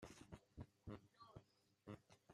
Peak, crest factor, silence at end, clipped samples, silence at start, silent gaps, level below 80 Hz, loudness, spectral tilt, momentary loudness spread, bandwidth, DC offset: -42 dBFS; 20 dB; 0 s; under 0.1%; 0 s; none; -74 dBFS; -62 LUFS; -6 dB/octave; 6 LU; 13.5 kHz; under 0.1%